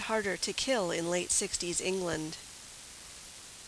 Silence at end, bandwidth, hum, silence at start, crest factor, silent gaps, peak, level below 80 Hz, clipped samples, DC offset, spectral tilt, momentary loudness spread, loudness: 0 s; 11 kHz; none; 0 s; 18 dB; none; -16 dBFS; -60 dBFS; under 0.1%; under 0.1%; -2.5 dB/octave; 17 LU; -31 LUFS